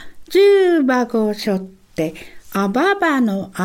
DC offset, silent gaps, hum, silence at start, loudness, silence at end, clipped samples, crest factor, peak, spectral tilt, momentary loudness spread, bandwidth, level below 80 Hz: under 0.1%; none; none; 0 s; -17 LUFS; 0 s; under 0.1%; 12 dB; -4 dBFS; -6 dB/octave; 12 LU; 16.5 kHz; -52 dBFS